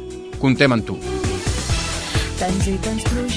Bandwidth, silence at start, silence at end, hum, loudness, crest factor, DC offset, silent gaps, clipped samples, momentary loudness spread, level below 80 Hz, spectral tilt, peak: 11 kHz; 0 s; 0 s; none; -20 LUFS; 20 dB; under 0.1%; none; under 0.1%; 7 LU; -28 dBFS; -5 dB/octave; 0 dBFS